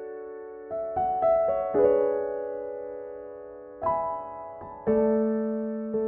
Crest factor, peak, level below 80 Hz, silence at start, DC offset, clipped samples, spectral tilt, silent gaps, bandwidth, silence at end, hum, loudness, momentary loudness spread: 18 dB; -10 dBFS; -58 dBFS; 0 s; under 0.1%; under 0.1%; -8.5 dB/octave; none; 3.2 kHz; 0 s; none; -27 LUFS; 17 LU